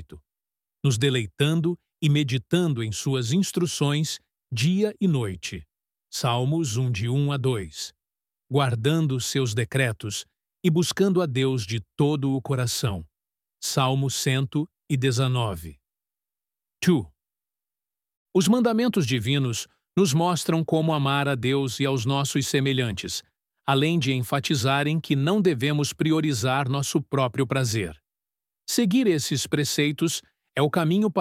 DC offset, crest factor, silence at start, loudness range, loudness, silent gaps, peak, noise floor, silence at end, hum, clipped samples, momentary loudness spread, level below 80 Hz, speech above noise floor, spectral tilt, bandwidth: under 0.1%; 18 dB; 0 s; 3 LU; -24 LUFS; 18.17-18.26 s; -6 dBFS; under -90 dBFS; 0 s; none; under 0.1%; 9 LU; -56 dBFS; over 67 dB; -5 dB/octave; 16 kHz